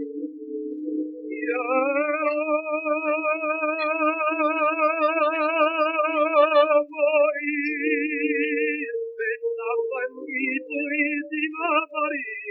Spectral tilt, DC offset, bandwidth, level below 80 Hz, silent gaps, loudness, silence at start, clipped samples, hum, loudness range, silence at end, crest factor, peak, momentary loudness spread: -5.5 dB/octave; under 0.1%; 5.6 kHz; under -90 dBFS; none; -23 LUFS; 0 s; under 0.1%; none; 5 LU; 0 s; 16 dB; -6 dBFS; 9 LU